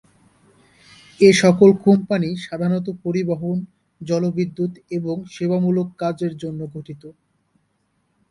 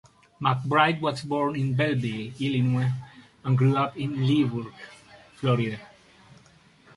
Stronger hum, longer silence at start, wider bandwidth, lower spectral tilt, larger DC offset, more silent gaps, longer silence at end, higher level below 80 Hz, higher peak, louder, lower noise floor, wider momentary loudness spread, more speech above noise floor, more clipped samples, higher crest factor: neither; first, 1.2 s vs 0.4 s; about the same, 11.5 kHz vs 11.5 kHz; about the same, -6.5 dB/octave vs -7.5 dB/octave; neither; neither; about the same, 1.2 s vs 1.1 s; about the same, -60 dBFS vs -62 dBFS; first, 0 dBFS vs -4 dBFS; first, -19 LUFS vs -26 LUFS; first, -68 dBFS vs -56 dBFS; first, 18 LU vs 14 LU; first, 49 dB vs 32 dB; neither; about the same, 20 dB vs 22 dB